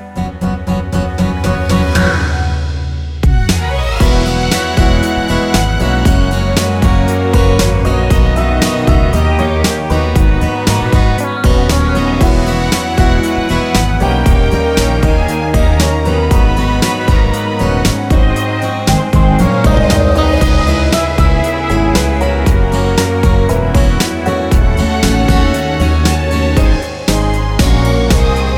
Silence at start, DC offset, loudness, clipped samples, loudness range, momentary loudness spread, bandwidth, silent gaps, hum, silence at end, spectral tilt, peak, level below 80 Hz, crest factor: 0 s; under 0.1%; -13 LUFS; under 0.1%; 2 LU; 4 LU; 16.5 kHz; none; none; 0 s; -5.5 dB/octave; 0 dBFS; -14 dBFS; 10 dB